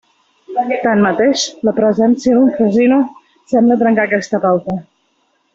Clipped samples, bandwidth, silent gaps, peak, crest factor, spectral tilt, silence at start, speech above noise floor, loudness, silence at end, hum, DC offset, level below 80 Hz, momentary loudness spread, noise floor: under 0.1%; 7.8 kHz; none; -2 dBFS; 12 dB; -5.5 dB/octave; 0.5 s; 49 dB; -14 LUFS; 0.7 s; none; under 0.1%; -54 dBFS; 8 LU; -61 dBFS